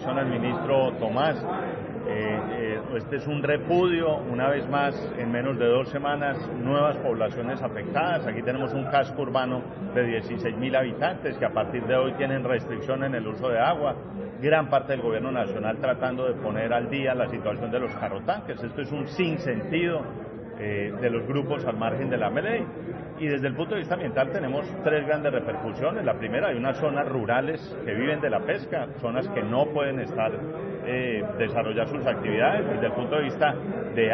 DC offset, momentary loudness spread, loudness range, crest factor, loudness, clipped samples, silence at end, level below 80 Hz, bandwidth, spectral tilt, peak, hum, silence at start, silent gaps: under 0.1%; 7 LU; 3 LU; 18 dB; -27 LUFS; under 0.1%; 0 s; -56 dBFS; 6 kHz; -5 dB/octave; -8 dBFS; none; 0 s; none